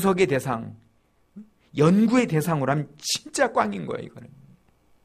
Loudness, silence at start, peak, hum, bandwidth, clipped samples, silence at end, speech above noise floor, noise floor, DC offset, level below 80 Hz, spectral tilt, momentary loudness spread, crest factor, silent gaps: -23 LUFS; 0 s; -6 dBFS; none; 15.5 kHz; under 0.1%; 0.8 s; 40 dB; -63 dBFS; under 0.1%; -60 dBFS; -5.5 dB/octave; 15 LU; 18 dB; none